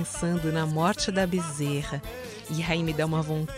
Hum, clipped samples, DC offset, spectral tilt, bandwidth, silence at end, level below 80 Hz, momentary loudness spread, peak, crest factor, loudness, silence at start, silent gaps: none; under 0.1%; under 0.1%; -5 dB/octave; 16 kHz; 0 s; -46 dBFS; 9 LU; -12 dBFS; 16 dB; -28 LUFS; 0 s; none